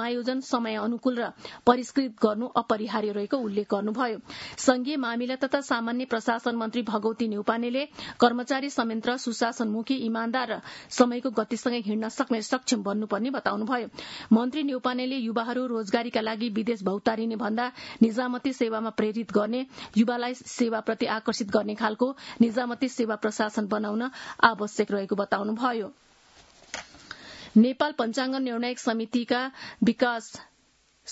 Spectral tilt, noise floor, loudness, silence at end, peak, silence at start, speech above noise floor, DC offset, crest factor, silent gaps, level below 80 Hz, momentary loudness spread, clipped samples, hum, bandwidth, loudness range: -4.5 dB/octave; -65 dBFS; -27 LUFS; 0 s; -2 dBFS; 0 s; 38 dB; under 0.1%; 26 dB; none; -68 dBFS; 7 LU; under 0.1%; none; 8 kHz; 1 LU